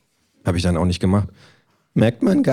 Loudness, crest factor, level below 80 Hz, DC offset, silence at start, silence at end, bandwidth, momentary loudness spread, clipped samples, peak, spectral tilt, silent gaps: -20 LUFS; 16 dB; -40 dBFS; under 0.1%; 0.45 s; 0 s; 13 kHz; 9 LU; under 0.1%; -4 dBFS; -7 dB/octave; none